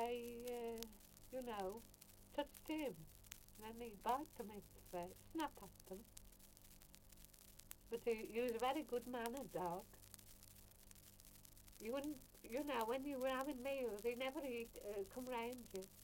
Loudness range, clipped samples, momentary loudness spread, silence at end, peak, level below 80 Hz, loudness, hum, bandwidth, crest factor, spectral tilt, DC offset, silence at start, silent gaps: 6 LU; under 0.1%; 19 LU; 0 s; -26 dBFS; -68 dBFS; -48 LUFS; none; 17 kHz; 22 dB; -4 dB/octave; under 0.1%; 0 s; none